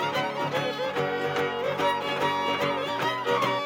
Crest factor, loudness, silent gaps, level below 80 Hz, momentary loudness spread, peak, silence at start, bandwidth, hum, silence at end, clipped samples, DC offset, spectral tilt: 14 dB; -27 LUFS; none; -72 dBFS; 2 LU; -14 dBFS; 0 s; 17 kHz; none; 0 s; under 0.1%; under 0.1%; -4.5 dB/octave